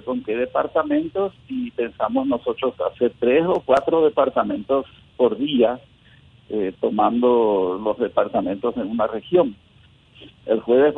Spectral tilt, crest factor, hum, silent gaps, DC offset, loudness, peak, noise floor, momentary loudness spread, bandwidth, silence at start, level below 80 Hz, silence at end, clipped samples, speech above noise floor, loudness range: -7.5 dB/octave; 16 dB; none; none; under 0.1%; -21 LUFS; -4 dBFS; -53 dBFS; 9 LU; 5.4 kHz; 0.05 s; -56 dBFS; 0 s; under 0.1%; 32 dB; 2 LU